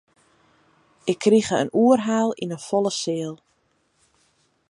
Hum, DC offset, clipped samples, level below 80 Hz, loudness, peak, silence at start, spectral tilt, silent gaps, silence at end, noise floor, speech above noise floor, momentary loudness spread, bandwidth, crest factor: none; under 0.1%; under 0.1%; -66 dBFS; -22 LUFS; -6 dBFS; 1.05 s; -5 dB/octave; none; 1.35 s; -67 dBFS; 46 dB; 12 LU; 11.5 kHz; 18 dB